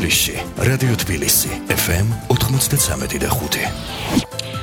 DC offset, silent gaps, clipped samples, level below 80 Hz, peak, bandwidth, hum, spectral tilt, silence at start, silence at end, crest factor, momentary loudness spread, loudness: under 0.1%; none; under 0.1%; -34 dBFS; -2 dBFS; 19 kHz; none; -3.5 dB/octave; 0 s; 0 s; 16 dB; 6 LU; -18 LUFS